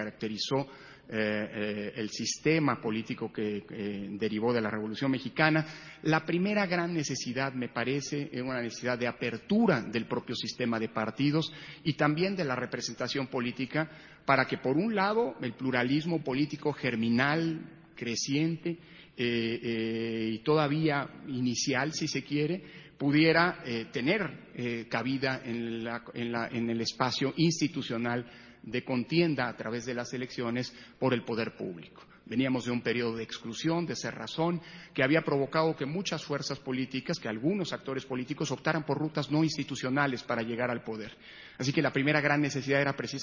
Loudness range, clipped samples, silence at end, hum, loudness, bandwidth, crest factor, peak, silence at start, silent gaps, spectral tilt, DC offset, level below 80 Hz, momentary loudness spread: 3 LU; under 0.1%; 0 s; none; -31 LUFS; 7.4 kHz; 24 dB; -8 dBFS; 0 s; none; -5 dB/octave; under 0.1%; -66 dBFS; 10 LU